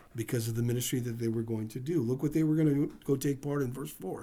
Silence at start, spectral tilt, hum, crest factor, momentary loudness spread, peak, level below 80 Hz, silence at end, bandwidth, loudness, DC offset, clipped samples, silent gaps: 0.15 s; -6.5 dB/octave; none; 14 dB; 8 LU; -18 dBFS; -58 dBFS; 0 s; over 20 kHz; -32 LUFS; under 0.1%; under 0.1%; none